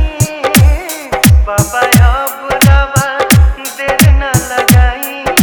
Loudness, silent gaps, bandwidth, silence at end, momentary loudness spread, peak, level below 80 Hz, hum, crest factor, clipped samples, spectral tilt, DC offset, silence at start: -10 LUFS; none; over 20 kHz; 0 s; 8 LU; 0 dBFS; -14 dBFS; none; 10 dB; 1%; -4.5 dB/octave; under 0.1%; 0 s